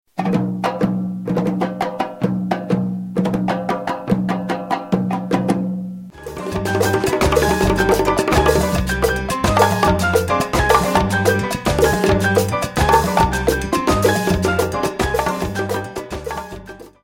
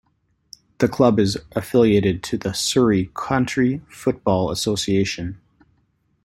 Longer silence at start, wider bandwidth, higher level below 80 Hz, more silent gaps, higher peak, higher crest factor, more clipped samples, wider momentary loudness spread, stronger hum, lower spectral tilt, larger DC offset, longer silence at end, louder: second, 0.15 s vs 0.8 s; about the same, 17 kHz vs 16.5 kHz; first, -32 dBFS vs -48 dBFS; neither; about the same, 0 dBFS vs -2 dBFS; about the same, 18 dB vs 18 dB; neither; about the same, 9 LU vs 8 LU; neither; about the same, -5.5 dB/octave vs -5.5 dB/octave; neither; second, 0.15 s vs 0.9 s; about the same, -18 LUFS vs -20 LUFS